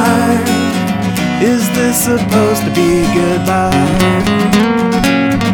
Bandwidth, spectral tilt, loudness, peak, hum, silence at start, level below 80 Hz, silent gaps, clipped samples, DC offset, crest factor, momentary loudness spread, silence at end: 19.5 kHz; -5 dB/octave; -12 LUFS; 0 dBFS; none; 0 s; -32 dBFS; none; under 0.1%; under 0.1%; 12 dB; 3 LU; 0 s